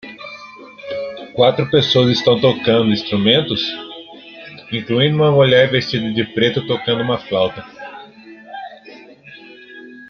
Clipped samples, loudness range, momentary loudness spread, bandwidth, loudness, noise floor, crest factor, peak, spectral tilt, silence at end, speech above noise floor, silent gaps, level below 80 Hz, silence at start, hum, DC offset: under 0.1%; 6 LU; 22 LU; 6.8 kHz; -16 LUFS; -41 dBFS; 16 dB; 0 dBFS; -6.5 dB/octave; 0.05 s; 25 dB; none; -56 dBFS; 0.05 s; none; under 0.1%